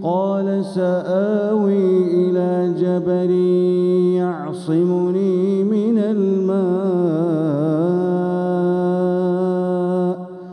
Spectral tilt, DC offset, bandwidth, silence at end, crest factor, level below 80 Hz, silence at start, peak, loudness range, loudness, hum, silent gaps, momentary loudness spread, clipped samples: -9.5 dB/octave; under 0.1%; 9.8 kHz; 0 s; 10 dB; -70 dBFS; 0 s; -6 dBFS; 1 LU; -18 LUFS; none; none; 4 LU; under 0.1%